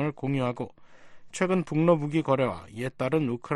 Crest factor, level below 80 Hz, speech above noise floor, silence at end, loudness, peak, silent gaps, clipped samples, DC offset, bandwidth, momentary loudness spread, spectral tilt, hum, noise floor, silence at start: 18 dB; -60 dBFS; 20 dB; 0 s; -27 LUFS; -10 dBFS; none; under 0.1%; under 0.1%; 12 kHz; 13 LU; -7 dB/octave; none; -46 dBFS; 0 s